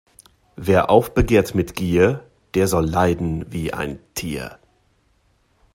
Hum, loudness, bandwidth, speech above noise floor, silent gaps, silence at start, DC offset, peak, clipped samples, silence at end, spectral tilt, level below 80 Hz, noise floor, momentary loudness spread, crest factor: none; -20 LUFS; 16.5 kHz; 43 dB; none; 0.6 s; under 0.1%; 0 dBFS; under 0.1%; 1.2 s; -6 dB/octave; -38 dBFS; -62 dBFS; 13 LU; 20 dB